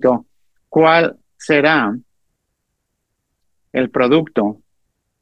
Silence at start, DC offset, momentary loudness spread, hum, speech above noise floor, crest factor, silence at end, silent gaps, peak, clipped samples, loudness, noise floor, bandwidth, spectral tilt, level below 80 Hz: 0 s; under 0.1%; 11 LU; none; 58 dB; 18 dB; 0.65 s; none; 0 dBFS; under 0.1%; -16 LUFS; -73 dBFS; 9.8 kHz; -6 dB/octave; -60 dBFS